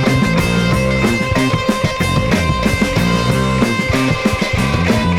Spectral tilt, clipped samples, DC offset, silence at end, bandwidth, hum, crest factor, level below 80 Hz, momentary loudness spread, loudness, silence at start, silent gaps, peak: -5.5 dB/octave; under 0.1%; under 0.1%; 0 s; 17 kHz; none; 10 dB; -28 dBFS; 2 LU; -15 LUFS; 0 s; none; -4 dBFS